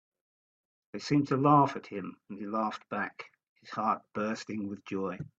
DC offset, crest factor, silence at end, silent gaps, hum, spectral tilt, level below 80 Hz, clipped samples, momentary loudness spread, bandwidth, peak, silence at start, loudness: under 0.1%; 22 dB; 0.1 s; 3.49-3.56 s; none; -7 dB/octave; -74 dBFS; under 0.1%; 18 LU; 7.8 kHz; -10 dBFS; 0.95 s; -31 LUFS